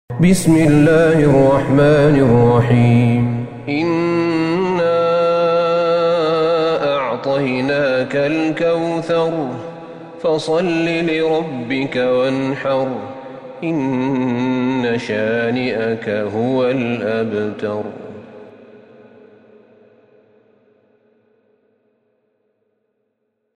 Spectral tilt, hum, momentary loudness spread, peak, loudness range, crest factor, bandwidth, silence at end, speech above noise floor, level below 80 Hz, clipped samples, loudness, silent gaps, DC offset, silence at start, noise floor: -7 dB/octave; none; 12 LU; 0 dBFS; 8 LU; 16 dB; 15 kHz; 5.05 s; 55 dB; -44 dBFS; under 0.1%; -16 LUFS; none; under 0.1%; 0.1 s; -71 dBFS